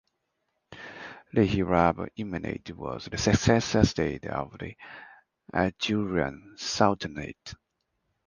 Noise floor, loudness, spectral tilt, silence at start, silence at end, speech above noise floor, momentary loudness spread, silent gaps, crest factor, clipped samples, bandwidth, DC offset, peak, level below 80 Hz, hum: -79 dBFS; -27 LUFS; -5.5 dB/octave; 0.7 s; 0.75 s; 51 dB; 20 LU; none; 24 dB; under 0.1%; 10 kHz; under 0.1%; -4 dBFS; -46 dBFS; none